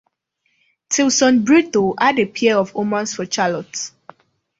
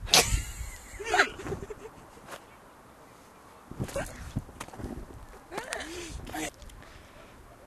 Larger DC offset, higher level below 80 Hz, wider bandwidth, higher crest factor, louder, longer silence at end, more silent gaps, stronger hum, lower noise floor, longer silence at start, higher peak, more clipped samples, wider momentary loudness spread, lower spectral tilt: neither; second, -60 dBFS vs -44 dBFS; second, 8 kHz vs 14 kHz; second, 16 dB vs 32 dB; first, -17 LUFS vs -32 LUFS; first, 0.7 s vs 0 s; neither; neither; first, -68 dBFS vs -53 dBFS; first, 0.9 s vs 0 s; about the same, -2 dBFS vs -2 dBFS; neither; second, 11 LU vs 26 LU; first, -3.5 dB/octave vs -2 dB/octave